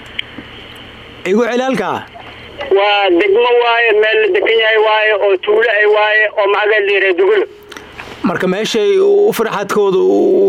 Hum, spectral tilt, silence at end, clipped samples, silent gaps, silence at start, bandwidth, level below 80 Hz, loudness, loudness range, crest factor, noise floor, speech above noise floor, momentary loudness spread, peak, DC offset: none; -4.5 dB/octave; 0 s; under 0.1%; none; 0 s; 16.5 kHz; -52 dBFS; -12 LUFS; 3 LU; 10 dB; -34 dBFS; 22 dB; 21 LU; -2 dBFS; under 0.1%